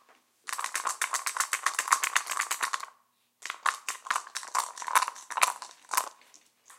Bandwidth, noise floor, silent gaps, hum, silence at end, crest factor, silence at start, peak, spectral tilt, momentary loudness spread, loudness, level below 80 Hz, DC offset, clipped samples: 17 kHz; -68 dBFS; none; none; 0.05 s; 30 dB; 0.45 s; -2 dBFS; 4 dB/octave; 12 LU; -30 LUFS; under -90 dBFS; under 0.1%; under 0.1%